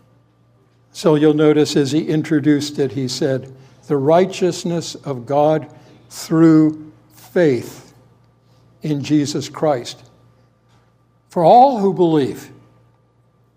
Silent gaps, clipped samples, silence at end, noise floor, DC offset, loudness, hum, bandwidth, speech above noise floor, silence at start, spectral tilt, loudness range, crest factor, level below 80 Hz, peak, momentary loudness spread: none; under 0.1%; 1.1 s; -57 dBFS; under 0.1%; -16 LUFS; none; 15.5 kHz; 41 dB; 0.95 s; -6.5 dB/octave; 5 LU; 16 dB; -64 dBFS; 0 dBFS; 15 LU